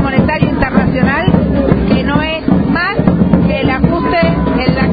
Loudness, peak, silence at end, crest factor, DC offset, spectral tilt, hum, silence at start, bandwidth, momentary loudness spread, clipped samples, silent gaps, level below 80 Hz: -12 LUFS; 0 dBFS; 0 s; 12 dB; under 0.1%; -11 dB/octave; none; 0 s; 5 kHz; 2 LU; 0.2%; none; -24 dBFS